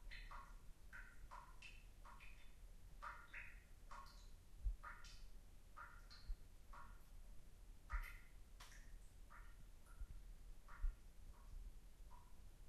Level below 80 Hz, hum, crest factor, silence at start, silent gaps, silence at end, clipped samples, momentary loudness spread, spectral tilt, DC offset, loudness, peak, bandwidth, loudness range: -56 dBFS; none; 22 dB; 0 s; none; 0 s; under 0.1%; 12 LU; -4 dB/octave; under 0.1%; -60 LUFS; -32 dBFS; 13 kHz; 3 LU